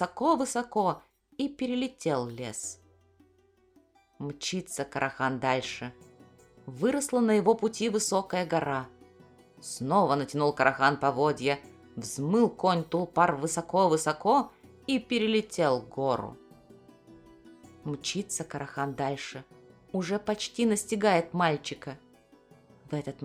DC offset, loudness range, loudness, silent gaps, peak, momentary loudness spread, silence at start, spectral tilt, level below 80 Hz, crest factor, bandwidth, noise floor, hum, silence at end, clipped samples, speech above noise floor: under 0.1%; 8 LU; -29 LUFS; none; -6 dBFS; 15 LU; 0 s; -4.5 dB/octave; -66 dBFS; 24 dB; 15 kHz; -65 dBFS; none; 0 s; under 0.1%; 37 dB